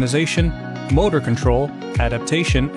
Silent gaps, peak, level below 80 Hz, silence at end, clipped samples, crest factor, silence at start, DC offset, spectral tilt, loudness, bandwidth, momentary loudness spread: none; -4 dBFS; -26 dBFS; 0 s; under 0.1%; 14 dB; 0 s; under 0.1%; -5.5 dB/octave; -19 LUFS; 11.5 kHz; 5 LU